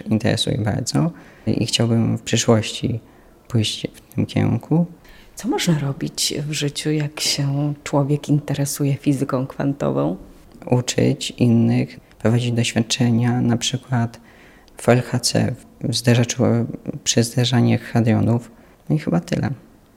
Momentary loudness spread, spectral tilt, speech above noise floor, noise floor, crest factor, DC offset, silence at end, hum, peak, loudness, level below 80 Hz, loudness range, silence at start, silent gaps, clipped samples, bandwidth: 8 LU; -5 dB/octave; 27 dB; -47 dBFS; 18 dB; under 0.1%; 0.35 s; none; -2 dBFS; -20 LUFS; -50 dBFS; 3 LU; 0.05 s; none; under 0.1%; 16 kHz